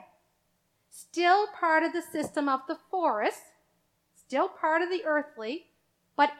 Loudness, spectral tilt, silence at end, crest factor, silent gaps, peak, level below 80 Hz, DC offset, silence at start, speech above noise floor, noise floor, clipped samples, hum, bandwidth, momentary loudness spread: -28 LUFS; -3 dB/octave; 0.05 s; 20 dB; none; -10 dBFS; -80 dBFS; under 0.1%; 0.95 s; 46 dB; -73 dBFS; under 0.1%; none; 15 kHz; 13 LU